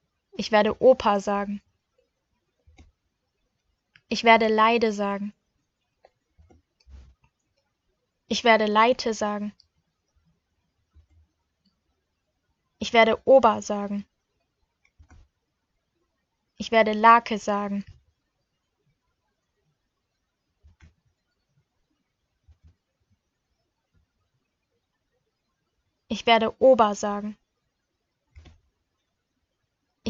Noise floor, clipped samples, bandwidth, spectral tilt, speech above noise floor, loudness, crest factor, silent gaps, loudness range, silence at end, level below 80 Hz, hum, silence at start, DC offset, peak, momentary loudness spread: -79 dBFS; under 0.1%; 7.8 kHz; -4.5 dB/octave; 57 dB; -21 LUFS; 24 dB; none; 11 LU; 0 s; -62 dBFS; none; 0.4 s; under 0.1%; -4 dBFS; 17 LU